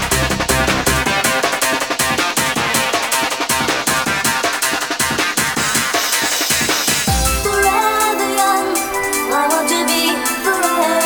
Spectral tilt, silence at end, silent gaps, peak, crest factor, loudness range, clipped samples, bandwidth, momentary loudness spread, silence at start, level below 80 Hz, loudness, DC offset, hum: -2 dB/octave; 0 s; none; 0 dBFS; 16 dB; 1 LU; under 0.1%; over 20 kHz; 2 LU; 0 s; -32 dBFS; -15 LUFS; 0.2%; none